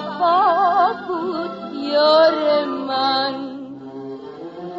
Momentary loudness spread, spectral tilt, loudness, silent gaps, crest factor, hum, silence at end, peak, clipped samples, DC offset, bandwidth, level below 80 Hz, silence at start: 19 LU; -5.5 dB/octave; -18 LUFS; none; 14 dB; none; 0 s; -4 dBFS; under 0.1%; under 0.1%; 7.8 kHz; -64 dBFS; 0 s